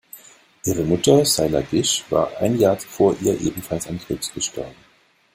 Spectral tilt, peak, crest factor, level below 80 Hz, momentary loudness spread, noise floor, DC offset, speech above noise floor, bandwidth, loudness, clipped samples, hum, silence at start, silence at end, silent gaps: -4.5 dB/octave; -2 dBFS; 18 dB; -48 dBFS; 12 LU; -58 dBFS; under 0.1%; 38 dB; 16 kHz; -20 LUFS; under 0.1%; none; 0.15 s; 0.65 s; none